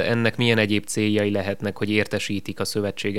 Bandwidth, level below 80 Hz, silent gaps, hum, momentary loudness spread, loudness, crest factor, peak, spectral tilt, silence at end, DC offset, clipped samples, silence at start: 16 kHz; -60 dBFS; none; none; 7 LU; -23 LUFS; 20 dB; -2 dBFS; -5 dB/octave; 0 s; 1%; under 0.1%; 0 s